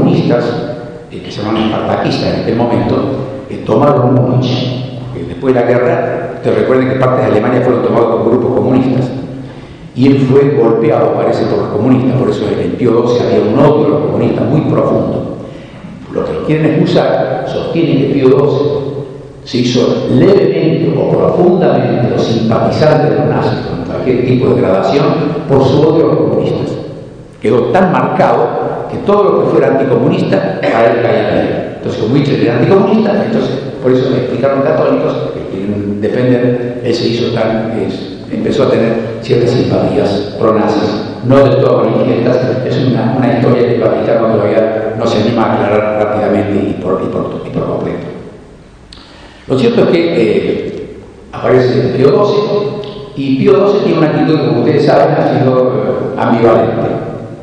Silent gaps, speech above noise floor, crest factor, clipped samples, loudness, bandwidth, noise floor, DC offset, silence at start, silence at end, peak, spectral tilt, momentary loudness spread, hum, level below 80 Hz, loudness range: none; 25 dB; 10 dB; 0.6%; -11 LUFS; 9.6 kHz; -35 dBFS; under 0.1%; 0 s; 0 s; 0 dBFS; -8 dB/octave; 10 LU; none; -42 dBFS; 3 LU